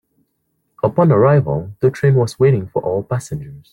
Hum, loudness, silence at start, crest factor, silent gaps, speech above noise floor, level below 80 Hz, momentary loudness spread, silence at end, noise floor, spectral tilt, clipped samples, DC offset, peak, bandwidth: none; -16 LUFS; 0.85 s; 14 dB; none; 53 dB; -50 dBFS; 11 LU; 0.15 s; -68 dBFS; -8.5 dB/octave; under 0.1%; under 0.1%; -2 dBFS; 11.5 kHz